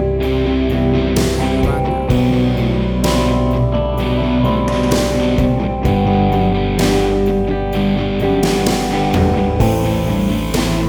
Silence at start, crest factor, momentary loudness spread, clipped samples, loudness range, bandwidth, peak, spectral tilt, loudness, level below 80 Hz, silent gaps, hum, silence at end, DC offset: 0 s; 12 dB; 3 LU; under 0.1%; 1 LU; over 20 kHz; -2 dBFS; -6.5 dB/octave; -16 LUFS; -24 dBFS; none; none; 0 s; under 0.1%